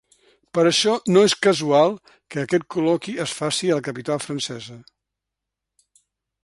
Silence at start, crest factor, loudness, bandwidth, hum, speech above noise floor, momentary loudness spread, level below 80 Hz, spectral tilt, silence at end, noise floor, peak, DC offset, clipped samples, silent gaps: 0.55 s; 18 dB; -20 LUFS; 11.5 kHz; none; 63 dB; 13 LU; -64 dBFS; -4 dB/octave; 1.65 s; -84 dBFS; -4 dBFS; under 0.1%; under 0.1%; none